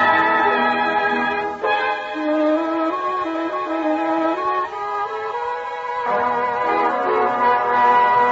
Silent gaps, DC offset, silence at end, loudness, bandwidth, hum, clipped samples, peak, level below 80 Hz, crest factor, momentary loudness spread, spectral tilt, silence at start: none; under 0.1%; 0 s; -19 LUFS; 7.8 kHz; none; under 0.1%; -4 dBFS; -60 dBFS; 14 dB; 9 LU; -5 dB/octave; 0 s